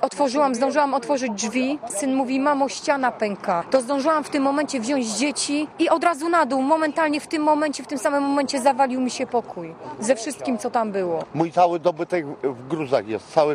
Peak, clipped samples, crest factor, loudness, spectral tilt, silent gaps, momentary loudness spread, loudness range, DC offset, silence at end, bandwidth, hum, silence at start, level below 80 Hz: -4 dBFS; under 0.1%; 18 dB; -22 LUFS; -4 dB/octave; none; 6 LU; 2 LU; under 0.1%; 0 s; 14.5 kHz; none; 0 s; -66 dBFS